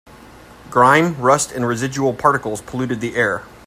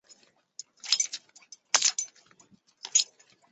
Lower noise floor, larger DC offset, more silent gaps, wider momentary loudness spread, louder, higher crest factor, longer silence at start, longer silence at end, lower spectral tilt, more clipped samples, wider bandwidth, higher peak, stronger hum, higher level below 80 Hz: second, -42 dBFS vs -62 dBFS; neither; neither; second, 10 LU vs 22 LU; first, -17 LUFS vs -26 LUFS; second, 18 dB vs 30 dB; second, 0.15 s vs 0.85 s; second, 0.2 s vs 0.45 s; first, -4.5 dB/octave vs 4 dB/octave; neither; first, 16 kHz vs 8.8 kHz; about the same, 0 dBFS vs -2 dBFS; neither; first, -50 dBFS vs -90 dBFS